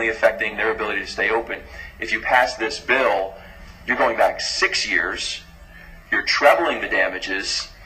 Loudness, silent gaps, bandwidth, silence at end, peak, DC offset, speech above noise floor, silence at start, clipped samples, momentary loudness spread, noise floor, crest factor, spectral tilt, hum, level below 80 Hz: -20 LUFS; none; 15.5 kHz; 0 s; 0 dBFS; under 0.1%; 21 dB; 0 s; under 0.1%; 12 LU; -42 dBFS; 20 dB; -2 dB/octave; none; -46 dBFS